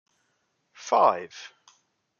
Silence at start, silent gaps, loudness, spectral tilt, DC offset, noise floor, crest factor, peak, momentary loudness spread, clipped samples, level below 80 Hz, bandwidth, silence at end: 0.8 s; none; -23 LUFS; -3 dB/octave; under 0.1%; -74 dBFS; 22 dB; -6 dBFS; 23 LU; under 0.1%; -82 dBFS; 7.2 kHz; 0.75 s